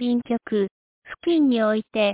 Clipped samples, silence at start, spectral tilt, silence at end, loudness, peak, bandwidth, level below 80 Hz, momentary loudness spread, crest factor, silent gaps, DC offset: under 0.1%; 0 s; -10 dB/octave; 0 s; -23 LUFS; -10 dBFS; 4 kHz; -64 dBFS; 10 LU; 12 dB; 0.71-1.02 s; under 0.1%